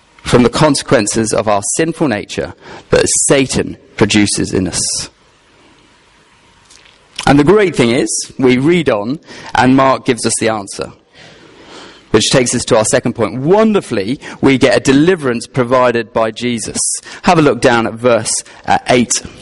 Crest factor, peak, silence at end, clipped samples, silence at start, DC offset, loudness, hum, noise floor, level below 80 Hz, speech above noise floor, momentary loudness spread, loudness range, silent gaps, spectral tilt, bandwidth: 14 dB; 0 dBFS; 0 s; under 0.1%; 0.25 s; under 0.1%; -12 LUFS; none; -48 dBFS; -38 dBFS; 36 dB; 9 LU; 4 LU; none; -4 dB/octave; 11.5 kHz